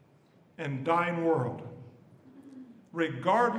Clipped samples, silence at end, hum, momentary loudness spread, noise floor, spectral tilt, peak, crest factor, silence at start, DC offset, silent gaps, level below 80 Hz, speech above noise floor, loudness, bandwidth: under 0.1%; 0 s; none; 23 LU; -62 dBFS; -7 dB/octave; -12 dBFS; 20 dB; 0.6 s; under 0.1%; none; -80 dBFS; 33 dB; -30 LUFS; 10.5 kHz